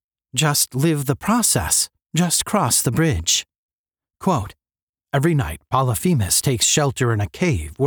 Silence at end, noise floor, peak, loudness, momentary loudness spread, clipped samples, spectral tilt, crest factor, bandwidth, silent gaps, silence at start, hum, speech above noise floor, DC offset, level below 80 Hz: 0 s; under -90 dBFS; -4 dBFS; -19 LUFS; 6 LU; under 0.1%; -4 dB/octave; 16 dB; over 20 kHz; 3.58-3.84 s, 4.83-4.93 s; 0.35 s; none; over 71 dB; under 0.1%; -40 dBFS